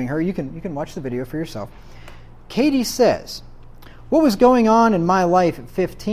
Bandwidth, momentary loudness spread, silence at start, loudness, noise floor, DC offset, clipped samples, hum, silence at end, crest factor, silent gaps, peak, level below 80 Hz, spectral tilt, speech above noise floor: 15.5 kHz; 15 LU; 0 s; -18 LUFS; -39 dBFS; under 0.1%; under 0.1%; none; 0 s; 16 dB; none; -2 dBFS; -44 dBFS; -6 dB/octave; 21 dB